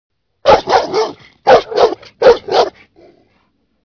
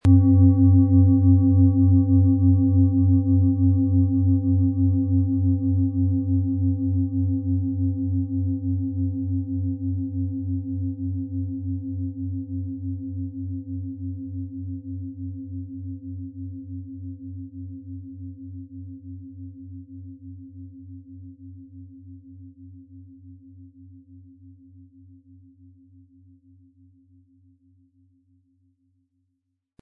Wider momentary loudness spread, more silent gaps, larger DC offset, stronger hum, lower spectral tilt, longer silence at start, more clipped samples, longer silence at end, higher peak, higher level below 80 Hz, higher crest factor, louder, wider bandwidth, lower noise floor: second, 9 LU vs 24 LU; neither; neither; neither; second, -4 dB/octave vs -13 dB/octave; first, 0.45 s vs 0.05 s; first, 0.4% vs under 0.1%; second, 1.2 s vs 5.3 s; first, 0 dBFS vs -6 dBFS; first, -44 dBFS vs -56 dBFS; about the same, 14 dB vs 18 dB; first, -13 LUFS vs -22 LUFS; first, 5.4 kHz vs 1.2 kHz; second, -60 dBFS vs -77 dBFS